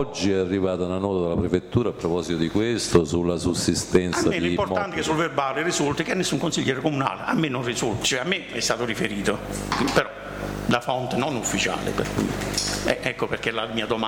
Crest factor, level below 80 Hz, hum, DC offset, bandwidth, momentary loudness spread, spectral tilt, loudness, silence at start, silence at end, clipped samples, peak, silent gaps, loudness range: 18 dB; -44 dBFS; none; under 0.1%; 19.5 kHz; 4 LU; -4.5 dB/octave; -24 LUFS; 0 s; 0 s; under 0.1%; -6 dBFS; none; 2 LU